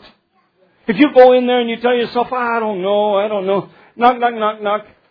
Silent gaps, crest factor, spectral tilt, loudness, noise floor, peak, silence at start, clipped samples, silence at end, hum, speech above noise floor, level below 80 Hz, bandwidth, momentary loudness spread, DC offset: none; 16 dB; -8 dB/octave; -15 LUFS; -59 dBFS; 0 dBFS; 0.9 s; 0.2%; 0.3 s; none; 45 dB; -58 dBFS; 5.2 kHz; 12 LU; under 0.1%